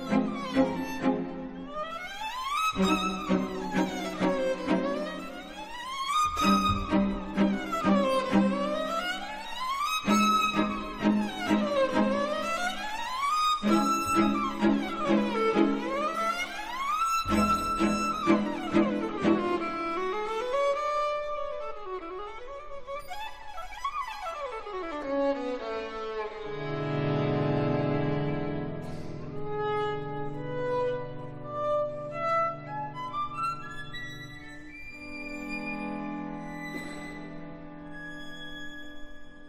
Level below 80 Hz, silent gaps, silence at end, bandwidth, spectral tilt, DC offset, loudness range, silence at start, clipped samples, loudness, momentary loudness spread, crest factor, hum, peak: -50 dBFS; none; 0 s; 15.5 kHz; -5.5 dB/octave; under 0.1%; 10 LU; 0 s; under 0.1%; -29 LUFS; 15 LU; 20 dB; none; -10 dBFS